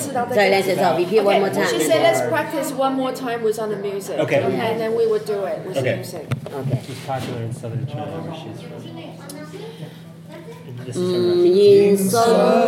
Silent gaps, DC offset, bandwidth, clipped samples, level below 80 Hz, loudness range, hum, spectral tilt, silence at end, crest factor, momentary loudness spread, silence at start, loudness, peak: none; under 0.1%; 16.5 kHz; under 0.1%; -66 dBFS; 12 LU; none; -5.5 dB/octave; 0 s; 16 dB; 20 LU; 0 s; -19 LUFS; -4 dBFS